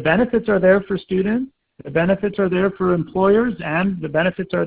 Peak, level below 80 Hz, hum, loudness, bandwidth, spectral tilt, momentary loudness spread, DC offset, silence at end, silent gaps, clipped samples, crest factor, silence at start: -2 dBFS; -46 dBFS; none; -19 LUFS; 4 kHz; -11 dB/octave; 6 LU; under 0.1%; 0 s; none; under 0.1%; 16 dB; 0 s